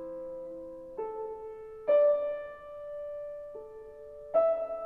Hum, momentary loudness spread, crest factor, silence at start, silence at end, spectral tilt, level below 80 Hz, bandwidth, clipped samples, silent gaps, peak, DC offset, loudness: none; 20 LU; 16 dB; 0 s; 0 s; -7 dB/octave; -66 dBFS; 3.8 kHz; under 0.1%; none; -16 dBFS; under 0.1%; -31 LUFS